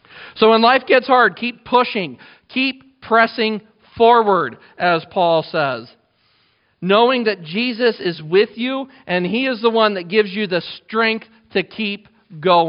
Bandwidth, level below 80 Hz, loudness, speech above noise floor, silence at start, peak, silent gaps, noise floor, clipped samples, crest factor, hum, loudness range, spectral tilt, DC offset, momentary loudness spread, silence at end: 5.4 kHz; -62 dBFS; -17 LUFS; 44 dB; 0.15 s; 0 dBFS; none; -60 dBFS; under 0.1%; 18 dB; none; 3 LU; -2.5 dB/octave; under 0.1%; 12 LU; 0 s